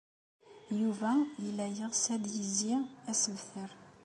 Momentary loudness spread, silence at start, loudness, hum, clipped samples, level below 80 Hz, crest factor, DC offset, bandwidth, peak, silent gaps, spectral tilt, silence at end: 11 LU; 0.45 s; -34 LUFS; none; under 0.1%; -80 dBFS; 16 dB; under 0.1%; 11.5 kHz; -20 dBFS; none; -3.5 dB/octave; 0.15 s